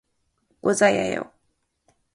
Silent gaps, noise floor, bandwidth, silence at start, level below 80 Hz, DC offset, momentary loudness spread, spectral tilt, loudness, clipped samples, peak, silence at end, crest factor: none; -72 dBFS; 11.5 kHz; 0.65 s; -62 dBFS; under 0.1%; 13 LU; -4 dB/octave; -22 LUFS; under 0.1%; -6 dBFS; 0.9 s; 20 dB